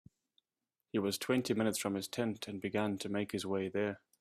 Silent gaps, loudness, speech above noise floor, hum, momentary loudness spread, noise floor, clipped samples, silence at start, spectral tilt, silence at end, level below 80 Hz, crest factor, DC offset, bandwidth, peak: none; -36 LUFS; over 54 dB; none; 5 LU; under -90 dBFS; under 0.1%; 0.95 s; -4.5 dB/octave; 0.25 s; -74 dBFS; 18 dB; under 0.1%; 15.5 kHz; -18 dBFS